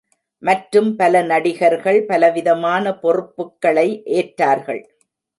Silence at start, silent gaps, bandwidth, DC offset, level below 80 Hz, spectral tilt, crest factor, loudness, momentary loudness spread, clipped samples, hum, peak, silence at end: 0.45 s; none; 11.5 kHz; under 0.1%; -70 dBFS; -6 dB/octave; 16 dB; -17 LUFS; 7 LU; under 0.1%; none; -2 dBFS; 0.6 s